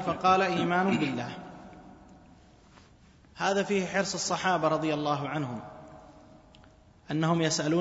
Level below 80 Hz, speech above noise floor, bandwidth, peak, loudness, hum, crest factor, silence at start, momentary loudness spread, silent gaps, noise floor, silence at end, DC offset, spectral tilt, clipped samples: -62 dBFS; 30 dB; 8 kHz; -10 dBFS; -28 LUFS; none; 20 dB; 0 s; 21 LU; none; -57 dBFS; 0 s; under 0.1%; -4.5 dB/octave; under 0.1%